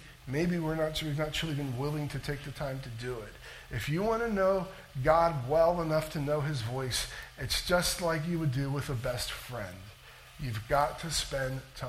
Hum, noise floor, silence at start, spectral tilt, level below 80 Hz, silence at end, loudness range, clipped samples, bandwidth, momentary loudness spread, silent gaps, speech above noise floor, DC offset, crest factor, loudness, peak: none; -52 dBFS; 0 s; -5 dB/octave; -48 dBFS; 0 s; 5 LU; under 0.1%; 16.5 kHz; 13 LU; none; 21 dB; under 0.1%; 20 dB; -32 LUFS; -12 dBFS